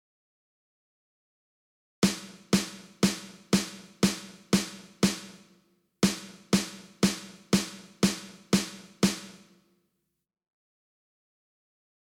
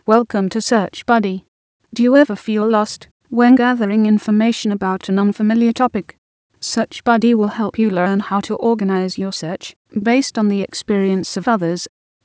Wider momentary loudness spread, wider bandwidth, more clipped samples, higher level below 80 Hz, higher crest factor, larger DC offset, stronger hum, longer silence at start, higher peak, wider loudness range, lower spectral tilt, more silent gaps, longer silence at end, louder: about the same, 11 LU vs 11 LU; first, 17 kHz vs 8 kHz; neither; about the same, -58 dBFS vs -58 dBFS; first, 22 dB vs 16 dB; neither; neither; first, 2 s vs 0.05 s; second, -10 dBFS vs 0 dBFS; about the same, 5 LU vs 3 LU; second, -4 dB/octave vs -5.5 dB/octave; second, none vs 1.48-1.80 s, 3.11-3.20 s, 6.18-6.50 s, 9.76-9.85 s; first, 2.75 s vs 0.4 s; second, -29 LUFS vs -17 LUFS